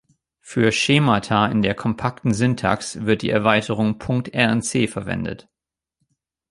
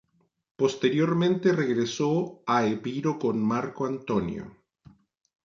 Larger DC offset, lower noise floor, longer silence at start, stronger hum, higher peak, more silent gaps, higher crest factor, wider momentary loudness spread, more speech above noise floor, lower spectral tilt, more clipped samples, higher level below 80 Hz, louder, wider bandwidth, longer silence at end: neither; first, -86 dBFS vs -57 dBFS; second, 0.45 s vs 0.6 s; neither; first, -2 dBFS vs -10 dBFS; neither; about the same, 18 dB vs 18 dB; about the same, 9 LU vs 7 LU; first, 67 dB vs 31 dB; second, -5 dB/octave vs -6.5 dB/octave; neither; first, -48 dBFS vs -62 dBFS; first, -20 LUFS vs -26 LUFS; first, 11.5 kHz vs 7.6 kHz; first, 1.15 s vs 0.95 s